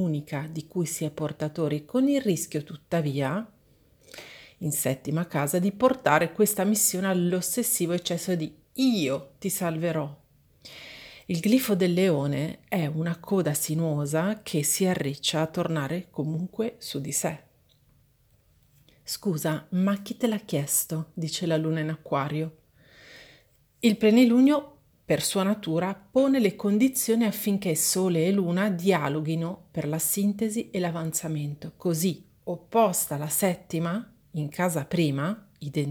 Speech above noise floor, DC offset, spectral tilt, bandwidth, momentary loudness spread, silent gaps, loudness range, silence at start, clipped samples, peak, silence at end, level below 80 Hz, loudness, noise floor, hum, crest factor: 37 dB; under 0.1%; -5 dB/octave; over 20 kHz; 11 LU; none; 6 LU; 0 s; under 0.1%; -6 dBFS; 0 s; -66 dBFS; -26 LUFS; -63 dBFS; none; 22 dB